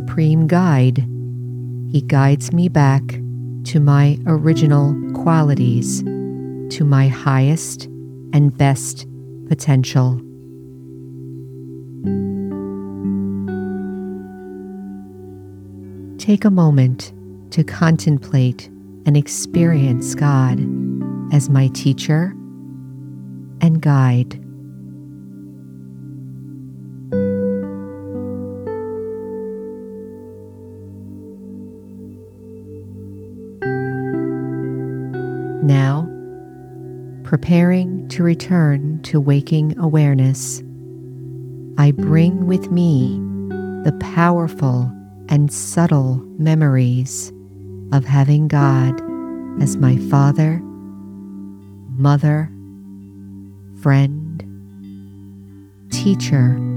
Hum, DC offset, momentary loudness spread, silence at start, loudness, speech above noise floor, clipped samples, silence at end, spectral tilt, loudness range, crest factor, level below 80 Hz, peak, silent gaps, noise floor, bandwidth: none; under 0.1%; 22 LU; 0 s; -17 LUFS; 26 dB; under 0.1%; 0 s; -7 dB/octave; 11 LU; 16 dB; -54 dBFS; -2 dBFS; none; -40 dBFS; 13 kHz